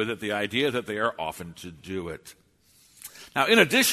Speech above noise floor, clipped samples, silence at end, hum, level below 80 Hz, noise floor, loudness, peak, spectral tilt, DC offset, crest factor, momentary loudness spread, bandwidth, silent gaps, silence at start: 35 dB; under 0.1%; 0 s; none; -62 dBFS; -60 dBFS; -25 LUFS; -4 dBFS; -3 dB/octave; under 0.1%; 22 dB; 23 LU; 13.5 kHz; none; 0 s